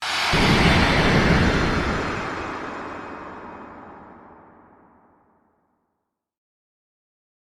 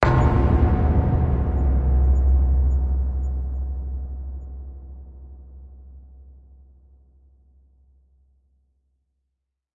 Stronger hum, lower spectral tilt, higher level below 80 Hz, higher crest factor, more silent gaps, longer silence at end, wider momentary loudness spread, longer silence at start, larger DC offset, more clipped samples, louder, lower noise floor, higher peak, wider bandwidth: neither; second, -5 dB/octave vs -9.5 dB/octave; second, -34 dBFS vs -24 dBFS; about the same, 18 dB vs 22 dB; neither; second, 3.35 s vs 3.55 s; about the same, 22 LU vs 23 LU; about the same, 0 s vs 0 s; neither; neither; about the same, -20 LUFS vs -22 LUFS; about the same, -79 dBFS vs -79 dBFS; about the same, -4 dBFS vs -2 dBFS; first, 14.5 kHz vs 4.5 kHz